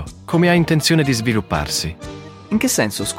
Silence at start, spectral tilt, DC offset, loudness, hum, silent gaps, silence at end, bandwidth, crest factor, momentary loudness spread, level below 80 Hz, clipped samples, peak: 0 s; -4.5 dB/octave; under 0.1%; -17 LUFS; none; none; 0 s; 16.5 kHz; 16 dB; 14 LU; -40 dBFS; under 0.1%; -2 dBFS